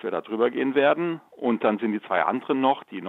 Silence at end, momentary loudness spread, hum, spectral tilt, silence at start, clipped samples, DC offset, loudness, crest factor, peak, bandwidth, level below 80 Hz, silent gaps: 0 s; 7 LU; none; -8 dB/octave; 0.05 s; under 0.1%; under 0.1%; -24 LUFS; 16 dB; -8 dBFS; 4.1 kHz; -78 dBFS; none